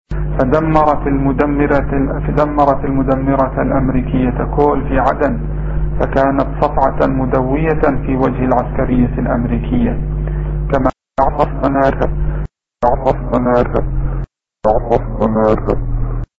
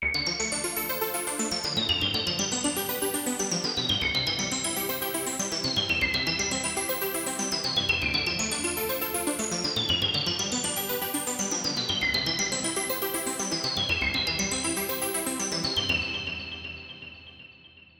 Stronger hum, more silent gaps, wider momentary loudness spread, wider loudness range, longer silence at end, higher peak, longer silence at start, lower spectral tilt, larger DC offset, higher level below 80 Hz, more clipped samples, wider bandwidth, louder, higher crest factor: neither; neither; first, 7 LU vs 4 LU; about the same, 2 LU vs 1 LU; about the same, 0.15 s vs 0.2 s; first, 0 dBFS vs -10 dBFS; about the same, 0.1 s vs 0 s; first, -10 dB/octave vs -2 dB/octave; neither; first, -22 dBFS vs -50 dBFS; neither; second, 6 kHz vs over 20 kHz; first, -15 LUFS vs -26 LUFS; about the same, 14 dB vs 18 dB